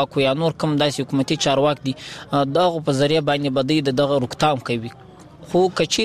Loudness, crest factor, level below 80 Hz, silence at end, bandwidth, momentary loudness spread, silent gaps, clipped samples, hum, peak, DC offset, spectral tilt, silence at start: -20 LUFS; 16 dB; -54 dBFS; 0 s; 15 kHz; 7 LU; none; under 0.1%; none; -4 dBFS; 0.1%; -5 dB/octave; 0 s